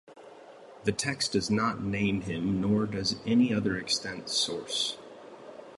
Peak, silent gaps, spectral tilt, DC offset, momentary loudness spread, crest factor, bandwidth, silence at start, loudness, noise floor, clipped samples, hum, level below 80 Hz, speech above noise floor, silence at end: -12 dBFS; none; -4 dB/octave; under 0.1%; 10 LU; 18 dB; 11.5 kHz; 0.1 s; -29 LUFS; -50 dBFS; under 0.1%; none; -56 dBFS; 21 dB; 0 s